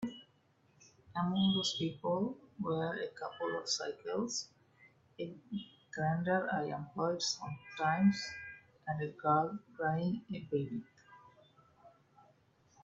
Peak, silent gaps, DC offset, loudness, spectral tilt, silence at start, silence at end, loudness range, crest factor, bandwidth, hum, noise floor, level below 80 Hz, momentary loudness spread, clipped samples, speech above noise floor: -16 dBFS; none; under 0.1%; -36 LUFS; -5 dB/octave; 0 s; 0.95 s; 4 LU; 20 dB; 8 kHz; none; -71 dBFS; -74 dBFS; 14 LU; under 0.1%; 35 dB